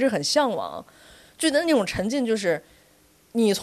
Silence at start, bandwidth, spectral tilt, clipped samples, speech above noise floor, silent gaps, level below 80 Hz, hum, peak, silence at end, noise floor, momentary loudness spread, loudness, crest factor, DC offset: 0 s; 13.5 kHz; -4 dB/octave; under 0.1%; 35 dB; none; -54 dBFS; none; -8 dBFS; 0 s; -58 dBFS; 10 LU; -24 LUFS; 16 dB; under 0.1%